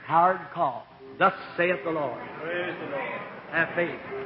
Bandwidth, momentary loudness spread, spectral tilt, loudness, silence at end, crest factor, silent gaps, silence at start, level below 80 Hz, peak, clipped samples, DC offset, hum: 5.8 kHz; 10 LU; -9.5 dB/octave; -27 LUFS; 0 s; 18 dB; none; 0 s; -68 dBFS; -8 dBFS; under 0.1%; under 0.1%; none